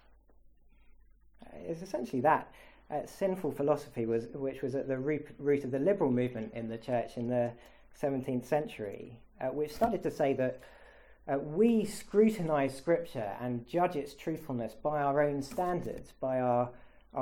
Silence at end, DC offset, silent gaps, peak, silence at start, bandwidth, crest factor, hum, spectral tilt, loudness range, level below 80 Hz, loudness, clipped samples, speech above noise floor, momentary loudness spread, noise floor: 0 s; under 0.1%; none; -12 dBFS; 0.9 s; 17.5 kHz; 20 dB; none; -7 dB/octave; 4 LU; -60 dBFS; -33 LUFS; under 0.1%; 28 dB; 11 LU; -60 dBFS